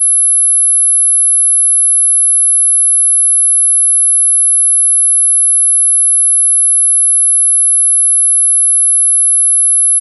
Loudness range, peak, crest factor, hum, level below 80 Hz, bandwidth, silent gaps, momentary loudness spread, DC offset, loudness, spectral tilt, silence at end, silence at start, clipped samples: 0 LU; -6 dBFS; 4 dB; none; under -90 dBFS; 12 kHz; none; 0 LU; under 0.1%; -6 LUFS; 9.5 dB/octave; 0 s; 0 s; under 0.1%